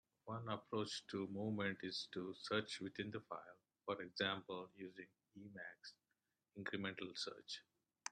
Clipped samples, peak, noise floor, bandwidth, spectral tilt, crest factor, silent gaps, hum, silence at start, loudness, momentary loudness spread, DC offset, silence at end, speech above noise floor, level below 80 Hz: under 0.1%; -24 dBFS; -90 dBFS; 10.5 kHz; -4.5 dB/octave; 24 dB; none; none; 0.25 s; -47 LUFS; 15 LU; under 0.1%; 0 s; 42 dB; -86 dBFS